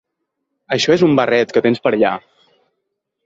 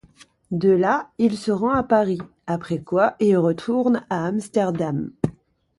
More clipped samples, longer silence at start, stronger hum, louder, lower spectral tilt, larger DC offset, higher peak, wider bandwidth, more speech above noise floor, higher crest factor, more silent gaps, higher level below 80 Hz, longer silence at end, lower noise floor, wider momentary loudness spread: neither; first, 0.7 s vs 0.5 s; neither; first, -15 LUFS vs -22 LUFS; second, -5.5 dB/octave vs -7.5 dB/octave; neither; about the same, -2 dBFS vs -4 dBFS; second, 7.8 kHz vs 11.5 kHz; first, 61 dB vs 32 dB; about the same, 16 dB vs 18 dB; neither; about the same, -58 dBFS vs -54 dBFS; first, 1.05 s vs 0.5 s; first, -75 dBFS vs -53 dBFS; second, 7 LU vs 10 LU